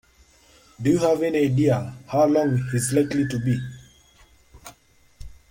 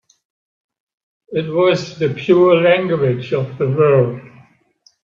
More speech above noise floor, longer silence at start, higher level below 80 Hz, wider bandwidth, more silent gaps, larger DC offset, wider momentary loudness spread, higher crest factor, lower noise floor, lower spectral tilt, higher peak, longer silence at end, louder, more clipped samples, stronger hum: second, 35 dB vs 42 dB; second, 0.8 s vs 1.3 s; first, -52 dBFS vs -58 dBFS; first, 16.5 kHz vs 7.2 kHz; neither; neither; second, 7 LU vs 10 LU; about the same, 16 dB vs 16 dB; about the same, -56 dBFS vs -56 dBFS; about the same, -6.5 dB/octave vs -7.5 dB/octave; second, -8 dBFS vs 0 dBFS; second, 0.15 s vs 0.75 s; second, -22 LUFS vs -15 LUFS; neither; neither